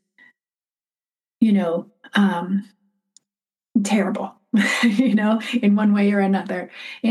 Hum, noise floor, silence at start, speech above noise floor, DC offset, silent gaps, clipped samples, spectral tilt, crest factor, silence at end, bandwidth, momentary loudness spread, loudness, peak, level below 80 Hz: none; under -90 dBFS; 1.4 s; over 71 dB; under 0.1%; none; under 0.1%; -6 dB/octave; 16 dB; 0 s; 12.5 kHz; 10 LU; -20 LUFS; -4 dBFS; -78 dBFS